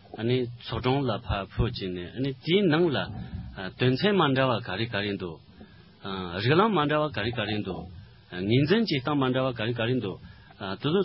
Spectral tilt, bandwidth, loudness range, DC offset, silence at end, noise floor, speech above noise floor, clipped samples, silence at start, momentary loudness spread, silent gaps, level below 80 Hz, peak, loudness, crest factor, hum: -10.5 dB/octave; 5.8 kHz; 2 LU; under 0.1%; 0 s; -51 dBFS; 24 dB; under 0.1%; 0.1 s; 15 LU; none; -46 dBFS; -8 dBFS; -27 LUFS; 18 dB; none